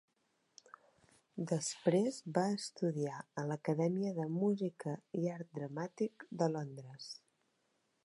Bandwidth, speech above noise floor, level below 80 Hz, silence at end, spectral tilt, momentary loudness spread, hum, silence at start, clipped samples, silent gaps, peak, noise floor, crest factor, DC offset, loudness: 11.5 kHz; 42 dB; -88 dBFS; 0.9 s; -6 dB/octave; 13 LU; none; 1.35 s; under 0.1%; none; -18 dBFS; -80 dBFS; 22 dB; under 0.1%; -38 LUFS